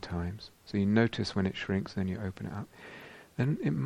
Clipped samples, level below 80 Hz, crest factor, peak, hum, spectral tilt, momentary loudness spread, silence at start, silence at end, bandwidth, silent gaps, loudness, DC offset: under 0.1%; -56 dBFS; 22 dB; -10 dBFS; none; -7 dB/octave; 19 LU; 0 s; 0 s; 12 kHz; none; -32 LUFS; under 0.1%